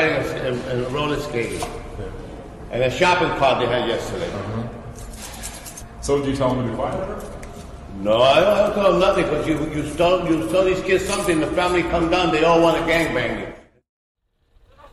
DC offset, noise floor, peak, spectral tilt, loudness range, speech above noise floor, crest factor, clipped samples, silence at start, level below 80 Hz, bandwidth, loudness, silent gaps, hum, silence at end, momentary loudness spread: under 0.1%; -57 dBFS; -4 dBFS; -5 dB/octave; 7 LU; 38 dB; 18 dB; under 0.1%; 0 s; -38 dBFS; 13.5 kHz; -20 LUFS; 13.89-14.15 s; none; 0.05 s; 18 LU